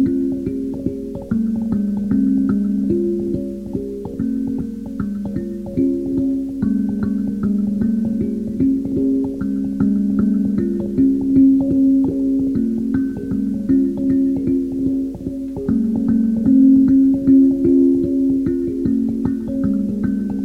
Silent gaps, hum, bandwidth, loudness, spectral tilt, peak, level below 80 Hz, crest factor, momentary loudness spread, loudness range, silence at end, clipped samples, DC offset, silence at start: none; none; 2.3 kHz; -18 LUFS; -10.5 dB/octave; -4 dBFS; -40 dBFS; 14 dB; 11 LU; 7 LU; 0 s; under 0.1%; under 0.1%; 0 s